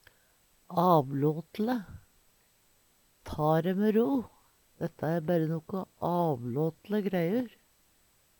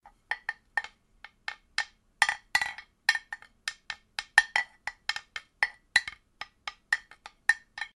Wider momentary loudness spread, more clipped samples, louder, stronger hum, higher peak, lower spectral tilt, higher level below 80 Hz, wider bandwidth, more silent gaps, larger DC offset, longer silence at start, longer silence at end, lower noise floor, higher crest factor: second, 13 LU vs 17 LU; neither; about the same, -30 LUFS vs -30 LUFS; neither; second, -12 dBFS vs -2 dBFS; first, -8.5 dB/octave vs 1.5 dB/octave; about the same, -62 dBFS vs -66 dBFS; first, 19 kHz vs 12 kHz; neither; neither; first, 0.7 s vs 0.05 s; first, 0.9 s vs 0.1 s; first, -67 dBFS vs -56 dBFS; second, 20 dB vs 30 dB